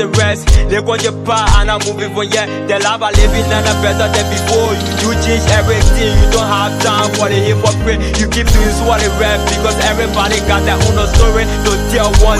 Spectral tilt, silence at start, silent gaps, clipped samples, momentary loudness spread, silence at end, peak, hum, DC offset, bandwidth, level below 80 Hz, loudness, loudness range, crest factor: -4.5 dB/octave; 0 s; none; 0.2%; 4 LU; 0 s; 0 dBFS; none; under 0.1%; 15.5 kHz; -16 dBFS; -12 LUFS; 1 LU; 10 dB